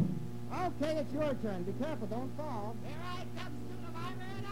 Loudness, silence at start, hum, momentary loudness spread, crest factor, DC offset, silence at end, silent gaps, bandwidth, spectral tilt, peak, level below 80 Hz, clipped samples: -39 LUFS; 0 s; 60 Hz at -45 dBFS; 8 LU; 18 dB; 0.9%; 0 s; none; 16 kHz; -7 dB/octave; -20 dBFS; -56 dBFS; under 0.1%